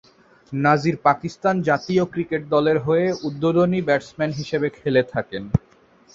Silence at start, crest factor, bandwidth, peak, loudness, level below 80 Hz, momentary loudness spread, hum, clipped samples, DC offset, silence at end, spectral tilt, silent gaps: 0.5 s; 20 dB; 7.6 kHz; -2 dBFS; -21 LUFS; -50 dBFS; 7 LU; none; under 0.1%; under 0.1%; 0.55 s; -7 dB/octave; none